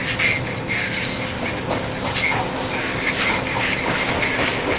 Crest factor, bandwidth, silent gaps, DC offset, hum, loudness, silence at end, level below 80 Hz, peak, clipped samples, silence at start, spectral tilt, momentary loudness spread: 16 dB; 4 kHz; none; under 0.1%; none; -21 LUFS; 0 s; -40 dBFS; -6 dBFS; under 0.1%; 0 s; -2.5 dB/octave; 5 LU